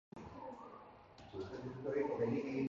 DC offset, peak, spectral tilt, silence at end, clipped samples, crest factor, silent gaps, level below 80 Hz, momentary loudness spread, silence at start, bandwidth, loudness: under 0.1%; -26 dBFS; -7 dB/octave; 0 s; under 0.1%; 18 dB; none; -68 dBFS; 19 LU; 0.15 s; 7.4 kHz; -42 LUFS